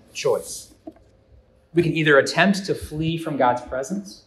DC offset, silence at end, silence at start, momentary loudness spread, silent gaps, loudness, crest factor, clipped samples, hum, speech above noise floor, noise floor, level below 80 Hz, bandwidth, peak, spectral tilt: under 0.1%; 0.1 s; 0.15 s; 14 LU; none; -21 LUFS; 22 dB; under 0.1%; none; 33 dB; -54 dBFS; -52 dBFS; 13.5 kHz; 0 dBFS; -5 dB/octave